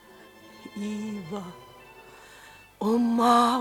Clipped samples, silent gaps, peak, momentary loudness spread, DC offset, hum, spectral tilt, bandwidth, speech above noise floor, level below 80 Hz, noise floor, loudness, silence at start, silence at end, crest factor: under 0.1%; none; -8 dBFS; 28 LU; under 0.1%; none; -5 dB/octave; 17 kHz; 26 dB; -64 dBFS; -51 dBFS; -26 LUFS; 0.45 s; 0 s; 20 dB